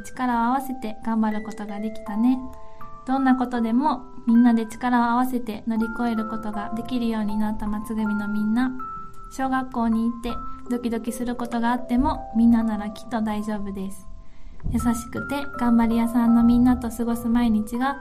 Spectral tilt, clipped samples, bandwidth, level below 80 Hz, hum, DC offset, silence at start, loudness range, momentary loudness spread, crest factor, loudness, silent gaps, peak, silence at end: -6.5 dB/octave; under 0.1%; 14.5 kHz; -40 dBFS; none; under 0.1%; 0 s; 5 LU; 12 LU; 14 dB; -24 LUFS; none; -8 dBFS; 0 s